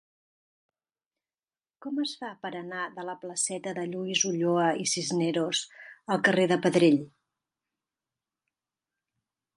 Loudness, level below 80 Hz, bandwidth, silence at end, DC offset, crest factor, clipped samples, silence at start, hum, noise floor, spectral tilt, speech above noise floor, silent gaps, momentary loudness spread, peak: -27 LUFS; -78 dBFS; 11.5 kHz; 2.5 s; under 0.1%; 22 dB; under 0.1%; 1.8 s; none; under -90 dBFS; -3.5 dB/octave; over 62 dB; none; 15 LU; -8 dBFS